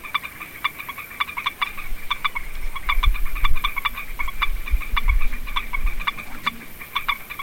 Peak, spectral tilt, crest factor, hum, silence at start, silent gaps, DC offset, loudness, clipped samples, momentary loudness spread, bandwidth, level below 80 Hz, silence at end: -4 dBFS; -3 dB/octave; 16 dB; none; 0 s; none; under 0.1%; -26 LUFS; under 0.1%; 6 LU; 17 kHz; -24 dBFS; 0 s